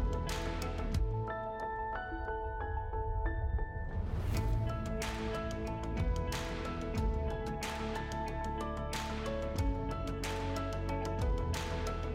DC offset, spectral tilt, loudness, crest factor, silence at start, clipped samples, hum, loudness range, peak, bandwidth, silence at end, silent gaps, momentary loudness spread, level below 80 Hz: under 0.1%; -6 dB/octave; -38 LUFS; 12 dB; 0 s; under 0.1%; none; 1 LU; -24 dBFS; 16 kHz; 0 s; none; 4 LU; -40 dBFS